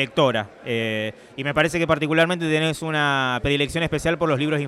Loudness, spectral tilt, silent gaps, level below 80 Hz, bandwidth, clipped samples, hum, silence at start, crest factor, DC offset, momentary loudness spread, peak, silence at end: -22 LUFS; -5 dB/octave; none; -46 dBFS; 14.5 kHz; under 0.1%; none; 0 s; 16 dB; under 0.1%; 7 LU; -6 dBFS; 0 s